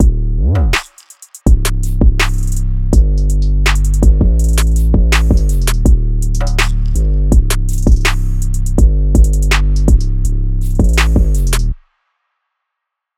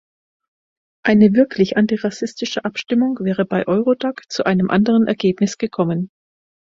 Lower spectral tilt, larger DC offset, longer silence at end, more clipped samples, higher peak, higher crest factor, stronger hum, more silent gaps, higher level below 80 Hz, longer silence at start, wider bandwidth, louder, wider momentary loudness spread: second, -5 dB/octave vs -6.5 dB/octave; neither; first, 1.4 s vs 0.7 s; neither; about the same, 0 dBFS vs 0 dBFS; second, 10 dB vs 18 dB; neither; neither; first, -12 dBFS vs -56 dBFS; second, 0 s vs 1.05 s; first, 15 kHz vs 7.6 kHz; first, -14 LUFS vs -18 LUFS; second, 6 LU vs 10 LU